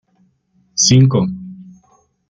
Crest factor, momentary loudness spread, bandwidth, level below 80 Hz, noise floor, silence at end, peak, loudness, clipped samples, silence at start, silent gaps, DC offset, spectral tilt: 16 dB; 21 LU; 9 kHz; -50 dBFS; -59 dBFS; 0.65 s; 0 dBFS; -13 LUFS; under 0.1%; 0.75 s; none; under 0.1%; -4.5 dB/octave